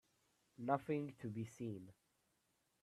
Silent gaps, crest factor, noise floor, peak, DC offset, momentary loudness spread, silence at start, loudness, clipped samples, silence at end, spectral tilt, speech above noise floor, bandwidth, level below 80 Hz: none; 24 dB; -83 dBFS; -22 dBFS; under 0.1%; 12 LU; 0.6 s; -45 LUFS; under 0.1%; 0.9 s; -8 dB/octave; 39 dB; 13.5 kHz; -82 dBFS